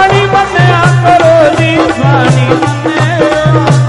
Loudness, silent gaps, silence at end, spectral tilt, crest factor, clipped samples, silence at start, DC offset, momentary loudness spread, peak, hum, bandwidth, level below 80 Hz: -7 LUFS; none; 0 s; -6.5 dB/octave; 6 dB; 0.5%; 0 s; under 0.1%; 5 LU; 0 dBFS; none; 11 kHz; -34 dBFS